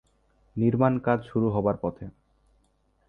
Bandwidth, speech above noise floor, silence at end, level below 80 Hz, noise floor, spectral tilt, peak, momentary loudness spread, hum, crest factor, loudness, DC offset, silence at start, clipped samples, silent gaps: 4 kHz; 43 dB; 1 s; -54 dBFS; -68 dBFS; -11 dB/octave; -8 dBFS; 17 LU; none; 20 dB; -26 LUFS; under 0.1%; 0.55 s; under 0.1%; none